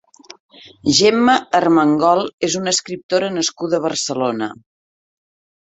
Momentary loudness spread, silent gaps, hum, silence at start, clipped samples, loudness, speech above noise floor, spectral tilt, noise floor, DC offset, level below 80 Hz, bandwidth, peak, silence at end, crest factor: 8 LU; 2.33-2.38 s, 3.03-3.09 s; none; 0.65 s; under 0.1%; -17 LUFS; over 73 dB; -3.5 dB/octave; under -90 dBFS; under 0.1%; -58 dBFS; 8.4 kHz; -2 dBFS; 1.2 s; 18 dB